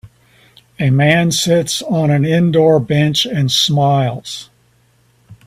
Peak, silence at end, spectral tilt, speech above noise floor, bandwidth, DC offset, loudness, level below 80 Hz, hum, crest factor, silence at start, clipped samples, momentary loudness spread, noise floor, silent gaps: 0 dBFS; 0.15 s; -5 dB/octave; 41 dB; 15.5 kHz; under 0.1%; -13 LUFS; -50 dBFS; none; 14 dB; 0.05 s; under 0.1%; 8 LU; -54 dBFS; none